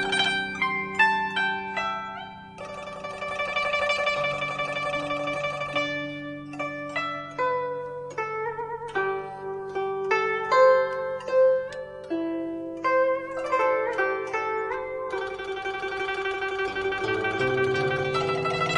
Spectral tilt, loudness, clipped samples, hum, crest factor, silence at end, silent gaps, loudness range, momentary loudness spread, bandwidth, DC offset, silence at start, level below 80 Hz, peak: -4.5 dB/octave; -26 LUFS; under 0.1%; none; 20 dB; 0 s; none; 6 LU; 12 LU; 11 kHz; under 0.1%; 0 s; -60 dBFS; -8 dBFS